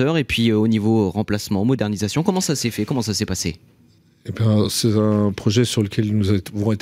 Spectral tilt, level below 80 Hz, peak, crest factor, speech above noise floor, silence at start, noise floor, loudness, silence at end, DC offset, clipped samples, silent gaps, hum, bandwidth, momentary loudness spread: -5.5 dB/octave; -50 dBFS; -4 dBFS; 14 dB; 35 dB; 0 s; -54 dBFS; -20 LUFS; 0 s; under 0.1%; under 0.1%; none; none; 16 kHz; 5 LU